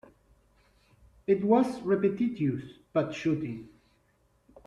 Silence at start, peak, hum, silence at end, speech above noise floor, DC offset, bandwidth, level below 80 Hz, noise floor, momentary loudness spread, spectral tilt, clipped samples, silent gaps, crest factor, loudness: 1.3 s; -12 dBFS; none; 1 s; 41 dB; under 0.1%; 11 kHz; -64 dBFS; -68 dBFS; 14 LU; -8 dB/octave; under 0.1%; none; 20 dB; -29 LUFS